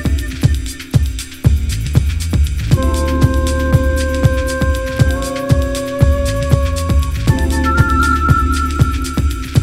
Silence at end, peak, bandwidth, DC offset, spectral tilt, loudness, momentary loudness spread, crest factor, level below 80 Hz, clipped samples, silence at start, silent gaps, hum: 0 s; 0 dBFS; 15.5 kHz; under 0.1%; -6 dB/octave; -15 LUFS; 5 LU; 14 dB; -18 dBFS; 0.3%; 0 s; none; none